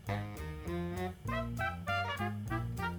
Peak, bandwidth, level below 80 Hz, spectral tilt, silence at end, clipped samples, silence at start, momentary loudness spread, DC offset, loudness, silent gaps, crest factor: -22 dBFS; over 20 kHz; -50 dBFS; -6 dB/octave; 0 s; under 0.1%; 0 s; 5 LU; under 0.1%; -38 LUFS; none; 16 dB